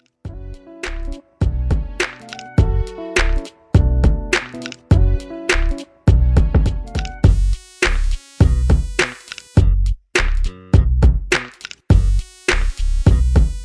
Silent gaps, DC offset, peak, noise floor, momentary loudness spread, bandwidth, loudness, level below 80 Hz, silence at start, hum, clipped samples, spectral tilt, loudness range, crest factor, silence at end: none; under 0.1%; 0 dBFS; -35 dBFS; 14 LU; 11 kHz; -18 LUFS; -18 dBFS; 0.25 s; none; under 0.1%; -5.5 dB/octave; 2 LU; 16 dB; 0 s